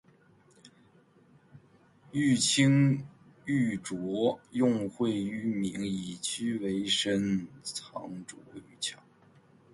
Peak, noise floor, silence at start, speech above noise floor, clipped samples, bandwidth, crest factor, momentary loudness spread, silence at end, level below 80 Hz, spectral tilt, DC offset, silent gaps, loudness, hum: -12 dBFS; -62 dBFS; 0.65 s; 32 dB; under 0.1%; 11.5 kHz; 20 dB; 17 LU; 0.8 s; -66 dBFS; -4.5 dB/octave; under 0.1%; none; -30 LUFS; none